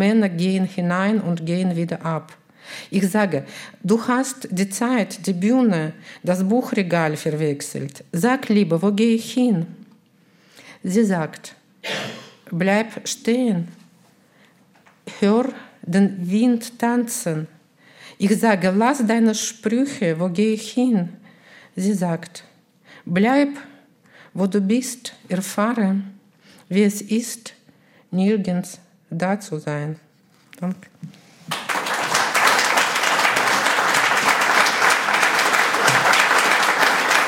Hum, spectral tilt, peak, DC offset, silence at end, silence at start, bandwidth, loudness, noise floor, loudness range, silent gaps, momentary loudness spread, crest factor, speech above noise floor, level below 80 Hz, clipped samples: none; -4.5 dB/octave; -2 dBFS; under 0.1%; 0 s; 0 s; 17 kHz; -20 LUFS; -56 dBFS; 8 LU; none; 15 LU; 20 dB; 36 dB; -70 dBFS; under 0.1%